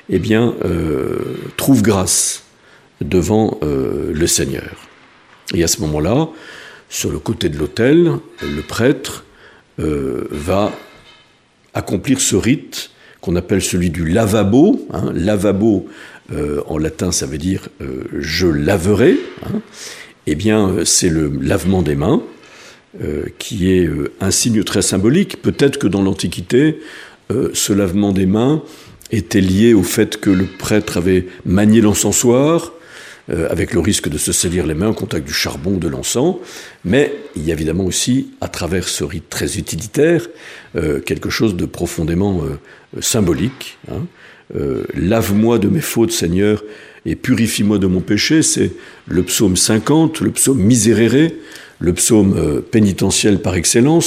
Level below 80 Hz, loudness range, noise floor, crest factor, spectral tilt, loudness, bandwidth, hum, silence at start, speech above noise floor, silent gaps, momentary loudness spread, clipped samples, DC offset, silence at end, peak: -38 dBFS; 5 LU; -53 dBFS; 16 dB; -4.5 dB/octave; -15 LUFS; 15.5 kHz; none; 0.1 s; 37 dB; none; 15 LU; under 0.1%; under 0.1%; 0 s; 0 dBFS